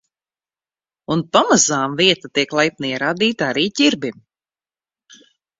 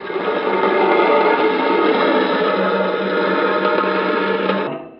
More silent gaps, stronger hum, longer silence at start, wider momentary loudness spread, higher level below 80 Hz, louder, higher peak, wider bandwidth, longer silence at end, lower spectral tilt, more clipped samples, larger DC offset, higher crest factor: neither; neither; first, 1.1 s vs 0 s; first, 9 LU vs 5 LU; first, -60 dBFS vs -68 dBFS; about the same, -17 LUFS vs -16 LUFS; first, 0 dBFS vs -4 dBFS; first, 7.8 kHz vs 5.8 kHz; first, 1.5 s vs 0.05 s; second, -3 dB/octave vs -8 dB/octave; neither; neither; first, 20 dB vs 14 dB